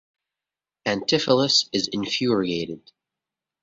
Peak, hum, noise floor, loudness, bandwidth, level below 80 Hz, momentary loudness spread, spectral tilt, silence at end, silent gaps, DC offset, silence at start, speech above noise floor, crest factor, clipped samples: -4 dBFS; none; -90 dBFS; -22 LUFS; 7.8 kHz; -62 dBFS; 12 LU; -3.5 dB/octave; 0.85 s; none; under 0.1%; 0.85 s; 67 dB; 20 dB; under 0.1%